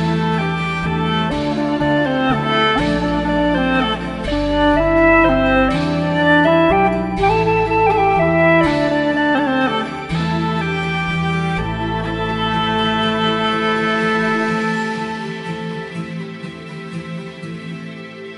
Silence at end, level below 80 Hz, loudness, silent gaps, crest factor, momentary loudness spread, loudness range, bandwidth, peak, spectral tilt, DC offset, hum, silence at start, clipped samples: 0 s; -34 dBFS; -17 LUFS; none; 16 dB; 15 LU; 6 LU; 11.5 kHz; 0 dBFS; -6.5 dB/octave; under 0.1%; none; 0 s; under 0.1%